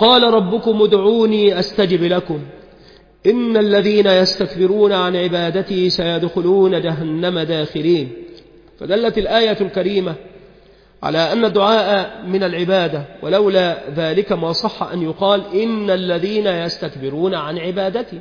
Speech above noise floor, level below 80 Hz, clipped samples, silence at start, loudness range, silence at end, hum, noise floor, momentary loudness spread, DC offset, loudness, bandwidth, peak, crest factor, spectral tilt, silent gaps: 31 dB; -48 dBFS; under 0.1%; 0 s; 4 LU; 0 s; none; -47 dBFS; 9 LU; under 0.1%; -16 LUFS; 5.2 kHz; 0 dBFS; 16 dB; -6.5 dB/octave; none